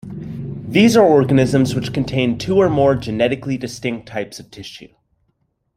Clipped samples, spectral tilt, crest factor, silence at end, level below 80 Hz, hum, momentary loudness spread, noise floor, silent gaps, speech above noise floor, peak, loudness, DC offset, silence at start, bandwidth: under 0.1%; -6.5 dB/octave; 16 dB; 0.9 s; -46 dBFS; none; 18 LU; -67 dBFS; none; 51 dB; -2 dBFS; -16 LUFS; under 0.1%; 0.05 s; 15 kHz